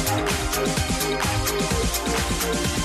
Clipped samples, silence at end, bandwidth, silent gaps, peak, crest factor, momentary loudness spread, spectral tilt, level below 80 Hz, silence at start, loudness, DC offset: under 0.1%; 0 s; 15 kHz; none; -10 dBFS; 14 dB; 1 LU; -3.5 dB/octave; -32 dBFS; 0 s; -23 LUFS; under 0.1%